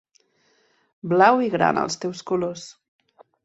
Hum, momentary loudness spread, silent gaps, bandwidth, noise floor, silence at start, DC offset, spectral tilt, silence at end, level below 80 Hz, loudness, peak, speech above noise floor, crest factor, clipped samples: none; 21 LU; none; 8.2 kHz; -64 dBFS; 1.05 s; under 0.1%; -5 dB/octave; 0.75 s; -66 dBFS; -21 LUFS; -2 dBFS; 43 dB; 22 dB; under 0.1%